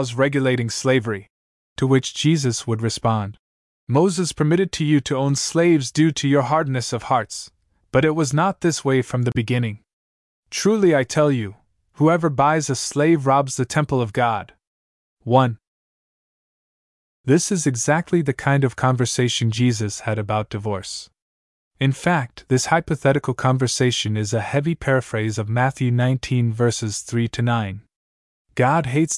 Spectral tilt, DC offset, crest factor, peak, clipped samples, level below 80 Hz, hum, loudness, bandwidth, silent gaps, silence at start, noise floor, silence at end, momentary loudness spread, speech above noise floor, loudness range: -5.5 dB/octave; under 0.1%; 18 dB; -2 dBFS; under 0.1%; -52 dBFS; none; -20 LUFS; 12 kHz; 1.30-1.76 s, 3.39-3.87 s, 9.93-10.43 s, 14.67-15.17 s, 15.67-17.24 s, 21.22-21.71 s, 27.96-28.45 s; 0 s; under -90 dBFS; 0 s; 8 LU; over 71 dB; 4 LU